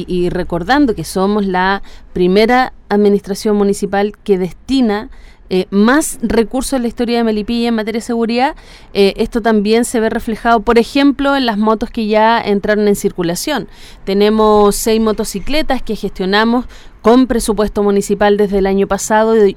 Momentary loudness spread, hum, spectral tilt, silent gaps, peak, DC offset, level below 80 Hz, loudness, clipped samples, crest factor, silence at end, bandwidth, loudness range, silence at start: 8 LU; none; -5 dB/octave; none; 0 dBFS; under 0.1%; -32 dBFS; -14 LUFS; under 0.1%; 12 dB; 0 s; 16.5 kHz; 2 LU; 0 s